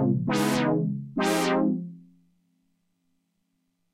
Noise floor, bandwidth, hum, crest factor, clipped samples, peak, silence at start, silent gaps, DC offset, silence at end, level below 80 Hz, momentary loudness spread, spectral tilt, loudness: -75 dBFS; 16 kHz; none; 16 dB; under 0.1%; -12 dBFS; 0 s; none; under 0.1%; 1.95 s; -66 dBFS; 7 LU; -5.5 dB/octave; -25 LUFS